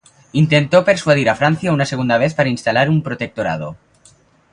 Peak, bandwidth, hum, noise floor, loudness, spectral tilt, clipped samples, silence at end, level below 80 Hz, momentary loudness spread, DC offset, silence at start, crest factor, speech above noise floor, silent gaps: 0 dBFS; 10.5 kHz; none; -51 dBFS; -16 LUFS; -6 dB/octave; under 0.1%; 0.75 s; -50 dBFS; 9 LU; under 0.1%; 0.35 s; 16 dB; 36 dB; none